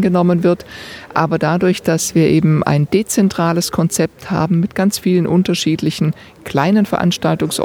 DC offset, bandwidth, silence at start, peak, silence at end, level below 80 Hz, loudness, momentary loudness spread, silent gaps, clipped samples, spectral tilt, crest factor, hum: under 0.1%; 18 kHz; 0 s; 0 dBFS; 0 s; -48 dBFS; -15 LUFS; 6 LU; none; under 0.1%; -5.5 dB/octave; 14 dB; none